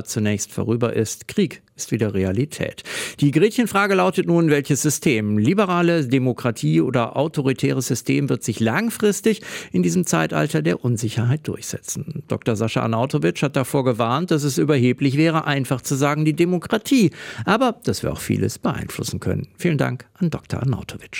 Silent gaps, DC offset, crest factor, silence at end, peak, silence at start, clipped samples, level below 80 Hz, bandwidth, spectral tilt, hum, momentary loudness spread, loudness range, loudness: none; under 0.1%; 16 dB; 0 s; -4 dBFS; 0 s; under 0.1%; -54 dBFS; 17 kHz; -5.5 dB/octave; none; 8 LU; 4 LU; -21 LUFS